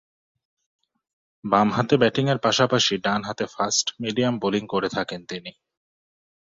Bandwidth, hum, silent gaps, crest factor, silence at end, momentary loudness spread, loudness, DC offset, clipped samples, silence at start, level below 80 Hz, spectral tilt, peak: 7.8 kHz; none; none; 22 dB; 1 s; 13 LU; -22 LUFS; under 0.1%; under 0.1%; 1.45 s; -62 dBFS; -4 dB/octave; -4 dBFS